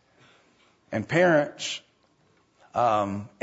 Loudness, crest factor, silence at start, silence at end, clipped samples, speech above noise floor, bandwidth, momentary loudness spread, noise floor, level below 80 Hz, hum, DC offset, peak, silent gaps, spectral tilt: -25 LUFS; 18 dB; 0.9 s; 0.15 s; under 0.1%; 40 dB; 8 kHz; 13 LU; -65 dBFS; -68 dBFS; none; under 0.1%; -8 dBFS; none; -5 dB/octave